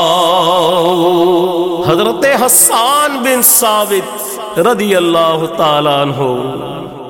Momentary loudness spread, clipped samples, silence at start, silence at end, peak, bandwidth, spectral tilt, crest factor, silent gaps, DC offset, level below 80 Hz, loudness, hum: 10 LU; under 0.1%; 0 s; 0 s; 0 dBFS; 17 kHz; -3 dB/octave; 12 dB; none; 0.2%; -52 dBFS; -10 LUFS; none